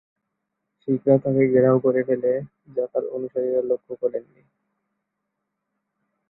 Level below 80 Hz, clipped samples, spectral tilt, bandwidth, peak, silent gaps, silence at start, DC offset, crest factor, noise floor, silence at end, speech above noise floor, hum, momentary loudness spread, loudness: -66 dBFS; under 0.1%; -14 dB/octave; 2.6 kHz; -4 dBFS; none; 0.85 s; under 0.1%; 20 dB; -80 dBFS; 2.1 s; 58 dB; none; 11 LU; -22 LUFS